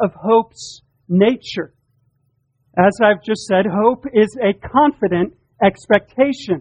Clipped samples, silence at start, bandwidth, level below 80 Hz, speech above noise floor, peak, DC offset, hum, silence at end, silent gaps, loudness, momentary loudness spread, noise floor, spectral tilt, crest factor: under 0.1%; 0 s; 9.8 kHz; -52 dBFS; 49 dB; 0 dBFS; under 0.1%; none; 0 s; none; -17 LUFS; 11 LU; -65 dBFS; -6.5 dB/octave; 18 dB